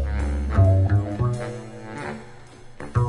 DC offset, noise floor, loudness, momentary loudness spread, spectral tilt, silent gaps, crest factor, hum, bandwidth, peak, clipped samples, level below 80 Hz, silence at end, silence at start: under 0.1%; -42 dBFS; -23 LUFS; 18 LU; -8.5 dB/octave; none; 16 dB; none; 10.5 kHz; -6 dBFS; under 0.1%; -32 dBFS; 0 s; 0 s